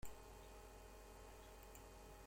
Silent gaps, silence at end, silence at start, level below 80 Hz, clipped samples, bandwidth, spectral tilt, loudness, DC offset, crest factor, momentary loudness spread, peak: none; 0 s; 0 s; -62 dBFS; under 0.1%; 16.5 kHz; -4 dB/octave; -60 LUFS; under 0.1%; 18 dB; 1 LU; -38 dBFS